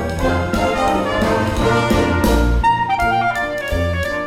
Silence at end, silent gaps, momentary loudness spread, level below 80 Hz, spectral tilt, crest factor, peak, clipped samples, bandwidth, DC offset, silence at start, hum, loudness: 0 s; none; 4 LU; -24 dBFS; -6 dB/octave; 14 dB; -2 dBFS; under 0.1%; 16.5 kHz; under 0.1%; 0 s; none; -17 LUFS